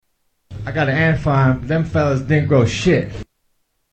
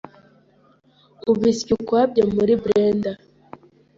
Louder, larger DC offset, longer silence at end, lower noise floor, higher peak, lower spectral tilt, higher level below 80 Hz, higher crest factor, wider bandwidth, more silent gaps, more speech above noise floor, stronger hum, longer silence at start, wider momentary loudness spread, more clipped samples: first, -17 LUFS vs -20 LUFS; neither; second, 0.7 s vs 0.85 s; first, -66 dBFS vs -57 dBFS; first, 0 dBFS vs -4 dBFS; about the same, -7 dB/octave vs -6.5 dB/octave; first, -38 dBFS vs -54 dBFS; about the same, 18 dB vs 16 dB; first, 8.6 kHz vs 7.8 kHz; neither; first, 50 dB vs 38 dB; neither; second, 0.5 s vs 1.25 s; first, 15 LU vs 10 LU; neither